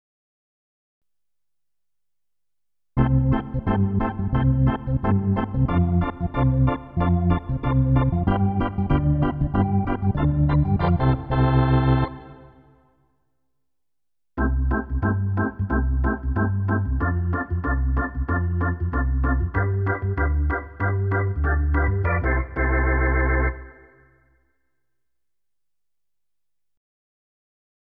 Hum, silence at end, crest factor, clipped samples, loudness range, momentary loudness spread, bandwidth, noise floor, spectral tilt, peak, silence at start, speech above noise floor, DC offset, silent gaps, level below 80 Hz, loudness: none; 4.25 s; 16 dB; under 0.1%; 6 LU; 5 LU; 4.5 kHz; -89 dBFS; -11.5 dB/octave; -6 dBFS; 2.95 s; 68 dB; under 0.1%; none; -28 dBFS; -23 LUFS